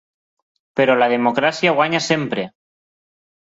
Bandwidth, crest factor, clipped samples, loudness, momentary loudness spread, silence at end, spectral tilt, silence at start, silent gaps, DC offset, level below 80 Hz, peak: 8 kHz; 18 dB; under 0.1%; -17 LUFS; 11 LU; 0.9 s; -4.5 dB/octave; 0.75 s; none; under 0.1%; -64 dBFS; -2 dBFS